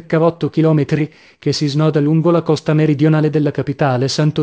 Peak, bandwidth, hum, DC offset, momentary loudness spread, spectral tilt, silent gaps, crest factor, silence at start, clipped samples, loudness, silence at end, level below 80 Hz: -2 dBFS; 8 kHz; none; under 0.1%; 6 LU; -7 dB/octave; none; 14 dB; 0.1 s; under 0.1%; -15 LUFS; 0 s; -52 dBFS